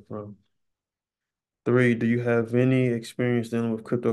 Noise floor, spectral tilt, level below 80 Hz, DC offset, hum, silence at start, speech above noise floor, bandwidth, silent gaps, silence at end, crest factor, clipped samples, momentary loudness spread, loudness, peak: under -90 dBFS; -8 dB/octave; -68 dBFS; under 0.1%; none; 0.1 s; over 66 dB; 12.5 kHz; none; 0 s; 18 dB; under 0.1%; 13 LU; -24 LUFS; -8 dBFS